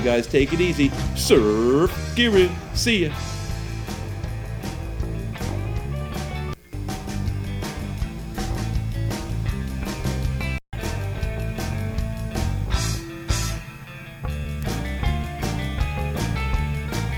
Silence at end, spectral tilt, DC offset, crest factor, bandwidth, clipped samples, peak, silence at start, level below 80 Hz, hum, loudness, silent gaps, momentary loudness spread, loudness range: 0 s; -5.5 dB/octave; under 0.1%; 22 dB; 19.5 kHz; under 0.1%; -2 dBFS; 0 s; -30 dBFS; none; -25 LUFS; none; 12 LU; 9 LU